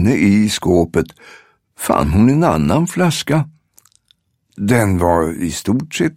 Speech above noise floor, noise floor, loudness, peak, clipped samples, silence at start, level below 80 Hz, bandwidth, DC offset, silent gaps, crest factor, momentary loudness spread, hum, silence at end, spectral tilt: 45 dB; -59 dBFS; -15 LUFS; 0 dBFS; under 0.1%; 0 s; -36 dBFS; 16.5 kHz; under 0.1%; none; 16 dB; 8 LU; none; 0.05 s; -6 dB/octave